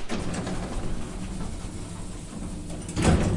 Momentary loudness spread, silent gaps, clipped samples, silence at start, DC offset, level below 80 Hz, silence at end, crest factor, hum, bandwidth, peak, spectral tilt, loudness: 13 LU; none; under 0.1%; 0 s; under 0.1%; -34 dBFS; 0 s; 22 dB; none; 11.5 kHz; -6 dBFS; -5.5 dB/octave; -31 LUFS